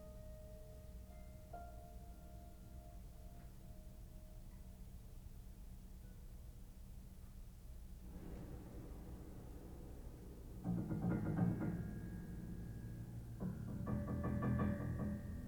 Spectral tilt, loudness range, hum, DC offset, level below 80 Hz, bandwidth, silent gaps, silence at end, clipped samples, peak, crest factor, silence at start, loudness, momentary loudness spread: -8.5 dB/octave; 14 LU; none; under 0.1%; -54 dBFS; over 20 kHz; none; 0 s; under 0.1%; -26 dBFS; 20 dB; 0 s; -47 LUFS; 18 LU